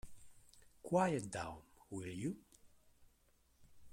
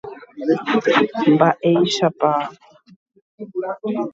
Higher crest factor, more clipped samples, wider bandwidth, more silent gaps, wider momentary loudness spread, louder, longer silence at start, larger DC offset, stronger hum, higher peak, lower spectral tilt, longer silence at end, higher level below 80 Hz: about the same, 22 dB vs 18 dB; neither; first, 16.5 kHz vs 7.8 kHz; second, none vs 2.96-3.06 s, 3.22-3.38 s; first, 22 LU vs 15 LU; second, -41 LUFS vs -18 LUFS; about the same, 0.05 s vs 0.05 s; neither; neither; second, -22 dBFS vs 0 dBFS; about the same, -6 dB/octave vs -5.5 dB/octave; about the same, 0 s vs 0.05 s; about the same, -68 dBFS vs -66 dBFS